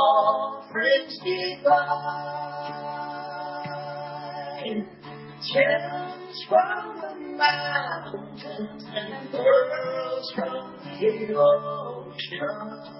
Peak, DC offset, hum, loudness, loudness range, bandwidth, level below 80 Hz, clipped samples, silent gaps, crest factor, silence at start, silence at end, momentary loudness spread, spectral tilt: -8 dBFS; under 0.1%; none; -26 LUFS; 4 LU; 5.8 kHz; -74 dBFS; under 0.1%; none; 18 dB; 0 s; 0 s; 15 LU; -8 dB/octave